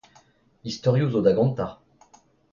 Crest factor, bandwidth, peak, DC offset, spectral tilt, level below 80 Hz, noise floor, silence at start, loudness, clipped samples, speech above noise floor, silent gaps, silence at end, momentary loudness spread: 20 dB; 7.4 kHz; -6 dBFS; under 0.1%; -7.5 dB/octave; -56 dBFS; -58 dBFS; 0.65 s; -23 LUFS; under 0.1%; 36 dB; none; 0.8 s; 14 LU